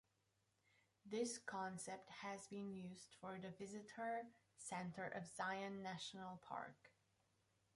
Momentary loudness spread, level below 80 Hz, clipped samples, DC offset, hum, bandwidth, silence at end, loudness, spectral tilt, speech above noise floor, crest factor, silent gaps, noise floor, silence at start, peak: 9 LU; -88 dBFS; under 0.1%; under 0.1%; none; 11.5 kHz; 0.85 s; -51 LUFS; -4 dB/octave; 35 dB; 20 dB; none; -85 dBFS; 1.05 s; -32 dBFS